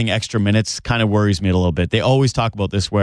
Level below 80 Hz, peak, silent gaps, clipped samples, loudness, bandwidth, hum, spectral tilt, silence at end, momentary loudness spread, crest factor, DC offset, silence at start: -38 dBFS; -4 dBFS; none; under 0.1%; -18 LUFS; 11 kHz; none; -5.5 dB/octave; 0 s; 4 LU; 12 dB; under 0.1%; 0 s